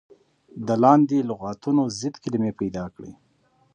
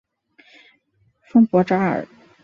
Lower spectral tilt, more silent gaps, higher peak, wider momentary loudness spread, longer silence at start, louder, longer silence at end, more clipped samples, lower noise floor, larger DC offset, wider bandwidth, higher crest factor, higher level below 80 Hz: second, -7 dB/octave vs -9 dB/octave; neither; about the same, -4 dBFS vs -4 dBFS; first, 17 LU vs 12 LU; second, 0.55 s vs 1.35 s; second, -22 LUFS vs -18 LUFS; first, 0.6 s vs 0.4 s; neither; about the same, -63 dBFS vs -63 dBFS; neither; first, 9.4 kHz vs 6.6 kHz; about the same, 20 dB vs 18 dB; first, -58 dBFS vs -64 dBFS